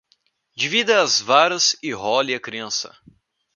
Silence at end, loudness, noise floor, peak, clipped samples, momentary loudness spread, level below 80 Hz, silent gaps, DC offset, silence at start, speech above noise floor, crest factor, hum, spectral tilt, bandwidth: 0.65 s; -19 LUFS; -65 dBFS; 0 dBFS; under 0.1%; 11 LU; -68 dBFS; none; under 0.1%; 0.55 s; 45 dB; 22 dB; none; -1 dB/octave; 10.5 kHz